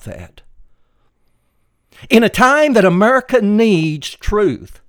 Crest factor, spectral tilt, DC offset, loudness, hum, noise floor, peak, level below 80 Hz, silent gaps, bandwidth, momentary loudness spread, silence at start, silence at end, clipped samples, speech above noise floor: 16 dB; -5.5 dB/octave; under 0.1%; -13 LUFS; none; -61 dBFS; 0 dBFS; -36 dBFS; none; 19 kHz; 11 LU; 0.05 s; 0.15 s; under 0.1%; 48 dB